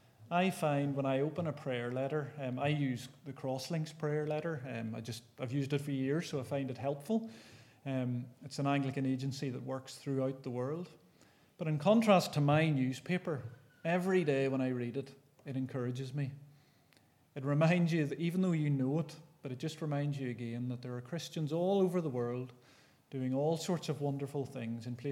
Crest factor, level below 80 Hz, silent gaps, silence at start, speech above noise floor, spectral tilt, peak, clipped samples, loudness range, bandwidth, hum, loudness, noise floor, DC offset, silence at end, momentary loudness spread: 20 dB; -82 dBFS; none; 0.2 s; 33 dB; -7 dB/octave; -14 dBFS; under 0.1%; 5 LU; 15.5 kHz; none; -35 LUFS; -68 dBFS; under 0.1%; 0 s; 13 LU